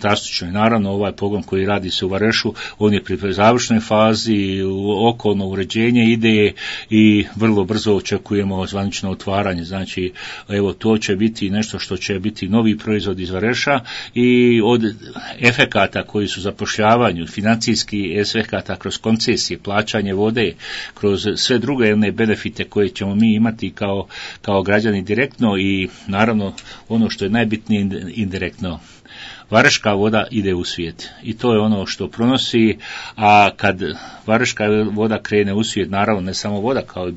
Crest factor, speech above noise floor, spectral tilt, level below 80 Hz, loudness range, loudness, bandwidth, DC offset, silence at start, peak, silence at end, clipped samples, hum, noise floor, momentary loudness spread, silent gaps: 18 dB; 20 dB; -5 dB/octave; -50 dBFS; 4 LU; -17 LUFS; 8 kHz; under 0.1%; 0 s; 0 dBFS; 0 s; under 0.1%; none; -37 dBFS; 10 LU; none